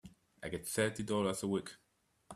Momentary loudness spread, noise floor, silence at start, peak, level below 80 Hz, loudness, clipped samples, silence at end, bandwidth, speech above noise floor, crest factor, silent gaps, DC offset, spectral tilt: 12 LU; -59 dBFS; 0.05 s; -18 dBFS; -68 dBFS; -37 LUFS; under 0.1%; 0 s; 15.5 kHz; 22 dB; 20 dB; none; under 0.1%; -4.5 dB/octave